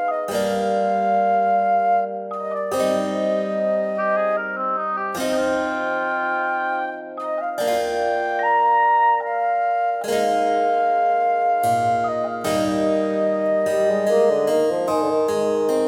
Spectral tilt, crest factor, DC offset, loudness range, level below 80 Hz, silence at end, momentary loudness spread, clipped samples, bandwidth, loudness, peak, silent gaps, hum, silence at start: -5 dB/octave; 12 dB; under 0.1%; 4 LU; -60 dBFS; 0 s; 6 LU; under 0.1%; 17 kHz; -20 LUFS; -8 dBFS; none; none; 0 s